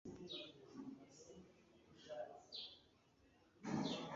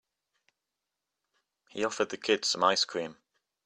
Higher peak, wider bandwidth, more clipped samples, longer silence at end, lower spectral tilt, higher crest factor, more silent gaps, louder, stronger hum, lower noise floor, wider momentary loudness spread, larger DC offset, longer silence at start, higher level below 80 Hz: second, -30 dBFS vs -8 dBFS; second, 7.4 kHz vs 12.5 kHz; neither; second, 0 s vs 0.55 s; first, -4 dB/octave vs -2 dB/octave; about the same, 22 dB vs 24 dB; neither; second, -51 LUFS vs -29 LUFS; second, none vs 50 Hz at -85 dBFS; second, -73 dBFS vs -87 dBFS; first, 21 LU vs 14 LU; neither; second, 0.05 s vs 1.75 s; about the same, -80 dBFS vs -76 dBFS